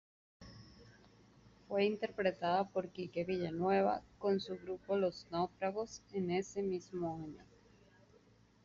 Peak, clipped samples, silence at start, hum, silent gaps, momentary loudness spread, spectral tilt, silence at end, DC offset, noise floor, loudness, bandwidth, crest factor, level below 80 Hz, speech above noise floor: -20 dBFS; under 0.1%; 0.4 s; none; none; 12 LU; -5 dB/octave; 1.2 s; under 0.1%; -67 dBFS; -38 LUFS; 7.4 kHz; 20 dB; -70 dBFS; 30 dB